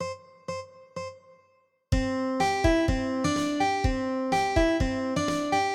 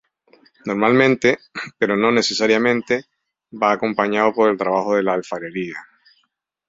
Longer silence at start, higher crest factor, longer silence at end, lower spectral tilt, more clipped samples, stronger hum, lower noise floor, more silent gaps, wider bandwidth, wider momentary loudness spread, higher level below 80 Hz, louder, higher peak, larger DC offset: second, 0 s vs 0.65 s; about the same, 16 dB vs 18 dB; second, 0 s vs 0.85 s; about the same, -5.5 dB/octave vs -4.5 dB/octave; neither; neither; about the same, -66 dBFS vs -69 dBFS; neither; first, 14.5 kHz vs 7.8 kHz; first, 15 LU vs 12 LU; first, -36 dBFS vs -62 dBFS; second, -27 LUFS vs -18 LUFS; second, -10 dBFS vs -2 dBFS; neither